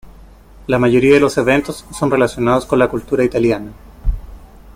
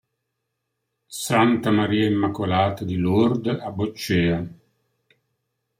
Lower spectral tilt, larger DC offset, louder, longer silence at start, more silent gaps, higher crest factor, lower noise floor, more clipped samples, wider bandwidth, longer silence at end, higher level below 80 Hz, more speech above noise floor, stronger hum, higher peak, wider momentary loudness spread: about the same, -6 dB/octave vs -6 dB/octave; neither; first, -15 LUFS vs -22 LUFS; second, 0.05 s vs 1.1 s; neither; about the same, 14 dB vs 18 dB; second, -40 dBFS vs -78 dBFS; neither; about the same, 16 kHz vs 16 kHz; second, 0.05 s vs 1.25 s; first, -30 dBFS vs -56 dBFS; second, 26 dB vs 57 dB; neither; first, -2 dBFS vs -6 dBFS; first, 16 LU vs 10 LU